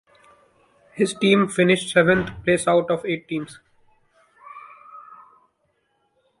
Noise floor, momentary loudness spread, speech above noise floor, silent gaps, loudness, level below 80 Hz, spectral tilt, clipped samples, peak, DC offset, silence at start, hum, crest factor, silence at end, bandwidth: -69 dBFS; 25 LU; 50 dB; none; -20 LUFS; -56 dBFS; -5 dB/octave; under 0.1%; -4 dBFS; under 0.1%; 0.95 s; none; 20 dB; 1.4 s; 11.5 kHz